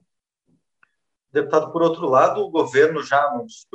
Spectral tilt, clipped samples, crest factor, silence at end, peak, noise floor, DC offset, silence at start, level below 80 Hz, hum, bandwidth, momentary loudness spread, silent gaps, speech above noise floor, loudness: -5.5 dB/octave; under 0.1%; 18 dB; 0.2 s; -2 dBFS; -71 dBFS; under 0.1%; 1.35 s; -74 dBFS; none; 8.4 kHz; 8 LU; none; 52 dB; -19 LUFS